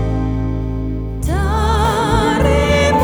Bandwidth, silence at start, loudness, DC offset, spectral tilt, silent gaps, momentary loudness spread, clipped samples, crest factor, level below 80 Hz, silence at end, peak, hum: 17.5 kHz; 0 s; -16 LUFS; under 0.1%; -6 dB/octave; none; 9 LU; under 0.1%; 14 dB; -20 dBFS; 0 s; -2 dBFS; none